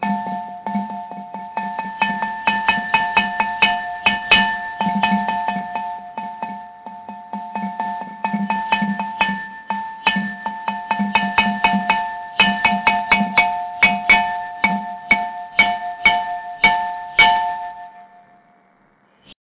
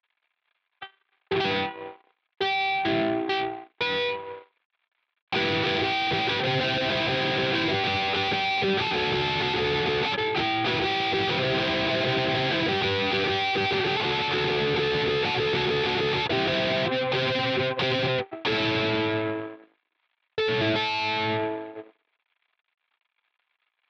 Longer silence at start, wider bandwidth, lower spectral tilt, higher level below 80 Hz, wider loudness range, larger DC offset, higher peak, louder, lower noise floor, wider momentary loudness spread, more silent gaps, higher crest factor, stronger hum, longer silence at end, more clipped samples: second, 0 s vs 0.8 s; second, 4 kHz vs 8.4 kHz; first, -7.5 dB/octave vs -5 dB/octave; about the same, -52 dBFS vs -56 dBFS; first, 8 LU vs 4 LU; neither; first, -2 dBFS vs -14 dBFS; first, -18 LUFS vs -25 LUFS; second, -57 dBFS vs -77 dBFS; first, 15 LU vs 6 LU; second, none vs 4.65-4.70 s, 5.22-5.27 s; about the same, 18 dB vs 14 dB; neither; second, 0.1 s vs 2.05 s; neither